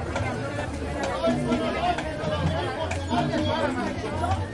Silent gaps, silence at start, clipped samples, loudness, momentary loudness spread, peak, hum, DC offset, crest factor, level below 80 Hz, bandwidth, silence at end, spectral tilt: none; 0 s; under 0.1%; -27 LUFS; 5 LU; -12 dBFS; none; under 0.1%; 14 dB; -42 dBFS; 11.5 kHz; 0 s; -6 dB/octave